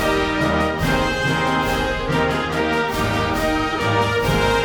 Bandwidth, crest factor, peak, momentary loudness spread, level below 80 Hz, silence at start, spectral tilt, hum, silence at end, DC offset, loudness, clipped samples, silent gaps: over 20 kHz; 14 dB; -4 dBFS; 2 LU; -32 dBFS; 0 s; -5 dB/octave; none; 0 s; under 0.1%; -19 LUFS; under 0.1%; none